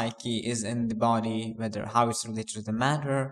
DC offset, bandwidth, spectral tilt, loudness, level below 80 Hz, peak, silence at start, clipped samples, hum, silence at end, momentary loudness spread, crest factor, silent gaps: under 0.1%; 13.5 kHz; -5 dB/octave; -29 LUFS; -64 dBFS; -8 dBFS; 0 s; under 0.1%; none; 0 s; 7 LU; 20 dB; none